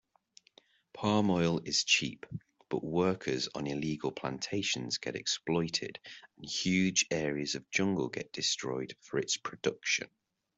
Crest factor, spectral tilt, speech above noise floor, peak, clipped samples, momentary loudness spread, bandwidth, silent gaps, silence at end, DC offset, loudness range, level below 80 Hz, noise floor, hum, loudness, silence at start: 20 dB; -3.5 dB/octave; 32 dB; -12 dBFS; under 0.1%; 11 LU; 8.2 kHz; none; 0.5 s; under 0.1%; 3 LU; -68 dBFS; -65 dBFS; none; -32 LUFS; 0.95 s